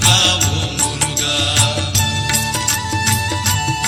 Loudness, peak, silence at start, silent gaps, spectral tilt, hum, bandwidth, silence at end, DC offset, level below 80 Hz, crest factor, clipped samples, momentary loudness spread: -15 LUFS; 0 dBFS; 0 s; none; -2 dB/octave; none; 18.5 kHz; 0 s; under 0.1%; -36 dBFS; 16 dB; under 0.1%; 4 LU